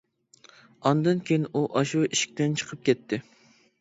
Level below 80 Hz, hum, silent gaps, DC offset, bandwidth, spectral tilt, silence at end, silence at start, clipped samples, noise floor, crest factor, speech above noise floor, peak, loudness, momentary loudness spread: -70 dBFS; none; none; under 0.1%; 8 kHz; -5 dB/octave; 0.6 s; 0.85 s; under 0.1%; -57 dBFS; 20 dB; 32 dB; -8 dBFS; -26 LUFS; 4 LU